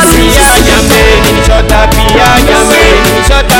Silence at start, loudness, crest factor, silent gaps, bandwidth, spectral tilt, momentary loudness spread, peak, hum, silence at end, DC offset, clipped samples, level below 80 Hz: 0 s; -5 LUFS; 4 dB; none; over 20 kHz; -3.5 dB/octave; 3 LU; 0 dBFS; none; 0 s; under 0.1%; 7%; -10 dBFS